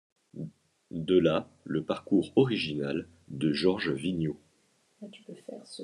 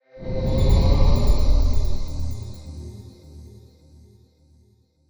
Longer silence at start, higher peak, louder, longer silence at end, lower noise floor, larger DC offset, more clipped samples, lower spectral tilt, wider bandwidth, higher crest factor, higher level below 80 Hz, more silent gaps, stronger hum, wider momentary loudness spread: first, 0.35 s vs 0.15 s; second, -12 dBFS vs -6 dBFS; second, -29 LUFS vs -23 LUFS; second, 0 s vs 1.55 s; first, -69 dBFS vs -59 dBFS; neither; neither; about the same, -7 dB/octave vs -7 dB/octave; second, 11 kHz vs over 20 kHz; about the same, 20 dB vs 16 dB; second, -64 dBFS vs -22 dBFS; neither; neither; second, 21 LU vs 24 LU